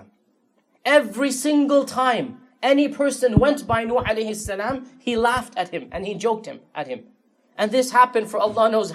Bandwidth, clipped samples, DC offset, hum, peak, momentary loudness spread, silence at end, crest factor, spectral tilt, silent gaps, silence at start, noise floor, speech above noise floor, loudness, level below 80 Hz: 15 kHz; under 0.1%; under 0.1%; none; -2 dBFS; 13 LU; 0 s; 18 dB; -5 dB/octave; none; 0.85 s; -65 dBFS; 44 dB; -21 LUFS; -46 dBFS